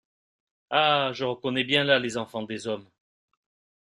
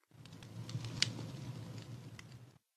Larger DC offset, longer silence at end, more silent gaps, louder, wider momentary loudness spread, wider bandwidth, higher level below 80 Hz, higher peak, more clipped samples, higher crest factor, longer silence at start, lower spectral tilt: neither; first, 1.1 s vs 0.2 s; neither; first, -25 LUFS vs -42 LUFS; second, 12 LU vs 20 LU; about the same, 12.5 kHz vs 13.5 kHz; about the same, -70 dBFS vs -70 dBFS; first, -4 dBFS vs -10 dBFS; neither; second, 24 dB vs 34 dB; first, 0.7 s vs 0.1 s; first, -4.5 dB/octave vs -3 dB/octave